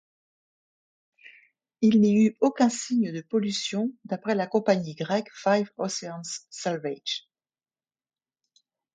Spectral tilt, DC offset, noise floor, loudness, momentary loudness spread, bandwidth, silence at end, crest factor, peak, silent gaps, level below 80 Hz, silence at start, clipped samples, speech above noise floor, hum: -5 dB/octave; under 0.1%; under -90 dBFS; -26 LUFS; 12 LU; 9.2 kHz; 1.75 s; 20 dB; -8 dBFS; none; -74 dBFS; 1.8 s; under 0.1%; over 65 dB; none